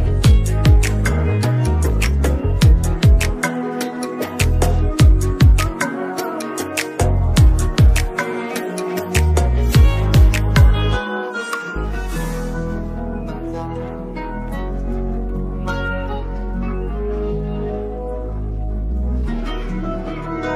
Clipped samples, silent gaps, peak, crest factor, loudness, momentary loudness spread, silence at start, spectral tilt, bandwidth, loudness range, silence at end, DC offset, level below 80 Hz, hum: under 0.1%; none; 0 dBFS; 16 dB; -19 LUFS; 12 LU; 0 s; -6 dB/octave; 15.5 kHz; 9 LU; 0 s; under 0.1%; -18 dBFS; none